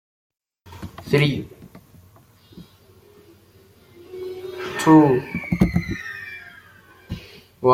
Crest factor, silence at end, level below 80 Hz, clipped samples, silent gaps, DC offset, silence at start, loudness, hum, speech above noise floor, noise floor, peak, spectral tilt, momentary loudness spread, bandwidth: 22 dB; 0 s; -44 dBFS; under 0.1%; none; under 0.1%; 0.65 s; -20 LUFS; none; 36 dB; -52 dBFS; -2 dBFS; -7 dB/octave; 25 LU; 16 kHz